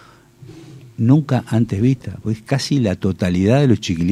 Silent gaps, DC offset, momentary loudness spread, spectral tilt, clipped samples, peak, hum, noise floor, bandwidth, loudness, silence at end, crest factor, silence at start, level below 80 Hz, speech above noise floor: none; under 0.1%; 9 LU; -7 dB/octave; under 0.1%; -2 dBFS; none; -43 dBFS; 12.5 kHz; -18 LUFS; 0 s; 16 dB; 0.4 s; -46 dBFS; 26 dB